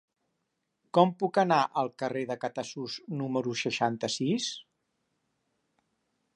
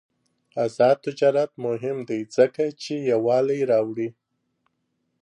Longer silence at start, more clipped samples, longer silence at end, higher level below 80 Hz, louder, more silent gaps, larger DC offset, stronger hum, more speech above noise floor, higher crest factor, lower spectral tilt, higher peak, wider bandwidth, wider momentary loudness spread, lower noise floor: first, 0.95 s vs 0.55 s; neither; first, 1.75 s vs 1.1 s; about the same, -80 dBFS vs -76 dBFS; second, -29 LUFS vs -23 LUFS; neither; neither; neither; about the same, 52 dB vs 52 dB; about the same, 22 dB vs 18 dB; second, -5 dB/octave vs -6.5 dB/octave; about the same, -8 dBFS vs -6 dBFS; about the same, 11 kHz vs 10.5 kHz; about the same, 11 LU vs 9 LU; first, -81 dBFS vs -74 dBFS